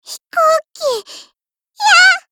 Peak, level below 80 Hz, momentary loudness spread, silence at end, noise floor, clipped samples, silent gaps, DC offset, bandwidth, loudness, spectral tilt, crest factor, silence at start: 0 dBFS; -68 dBFS; 13 LU; 0.1 s; -64 dBFS; under 0.1%; none; under 0.1%; 18.5 kHz; -12 LUFS; 2.5 dB/octave; 14 dB; 0.1 s